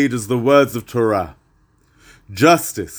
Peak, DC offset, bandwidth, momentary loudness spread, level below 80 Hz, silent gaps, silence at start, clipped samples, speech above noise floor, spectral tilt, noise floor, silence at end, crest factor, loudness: 0 dBFS; under 0.1%; over 20 kHz; 10 LU; -50 dBFS; none; 0 s; under 0.1%; 41 dB; -5 dB/octave; -57 dBFS; 0 s; 18 dB; -16 LUFS